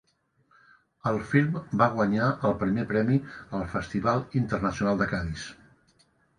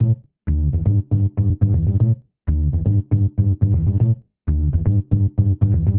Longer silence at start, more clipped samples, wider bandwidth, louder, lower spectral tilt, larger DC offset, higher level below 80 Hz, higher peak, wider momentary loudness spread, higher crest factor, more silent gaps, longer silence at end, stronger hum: first, 1.05 s vs 0 s; neither; first, 10 kHz vs 2.1 kHz; second, -27 LUFS vs -19 LUFS; second, -7.5 dB/octave vs -14.5 dB/octave; neither; second, -50 dBFS vs -24 dBFS; second, -8 dBFS vs -4 dBFS; first, 9 LU vs 5 LU; first, 20 dB vs 14 dB; neither; first, 0.85 s vs 0 s; neither